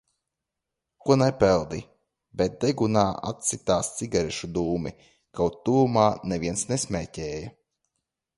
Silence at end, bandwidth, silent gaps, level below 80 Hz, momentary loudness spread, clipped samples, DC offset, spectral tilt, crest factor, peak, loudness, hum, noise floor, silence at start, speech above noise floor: 0.85 s; 11.5 kHz; none; -50 dBFS; 14 LU; under 0.1%; under 0.1%; -5 dB/octave; 22 dB; -4 dBFS; -25 LUFS; none; -85 dBFS; 1.05 s; 60 dB